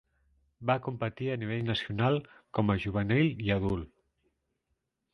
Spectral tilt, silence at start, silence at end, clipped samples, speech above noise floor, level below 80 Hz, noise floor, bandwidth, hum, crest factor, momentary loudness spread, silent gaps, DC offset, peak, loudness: -8.5 dB/octave; 0.6 s; 1.25 s; under 0.1%; 51 dB; -52 dBFS; -81 dBFS; 6.4 kHz; none; 20 dB; 9 LU; none; under 0.1%; -12 dBFS; -31 LUFS